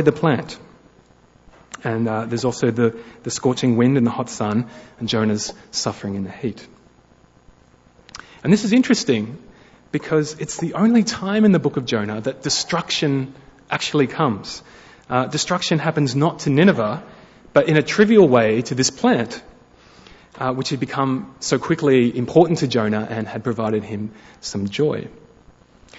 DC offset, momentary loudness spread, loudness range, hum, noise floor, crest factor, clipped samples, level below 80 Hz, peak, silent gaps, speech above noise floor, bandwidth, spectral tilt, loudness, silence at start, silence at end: under 0.1%; 14 LU; 7 LU; none; -53 dBFS; 18 dB; under 0.1%; -56 dBFS; -2 dBFS; none; 34 dB; 8 kHz; -5.5 dB/octave; -20 LUFS; 0 s; 0.85 s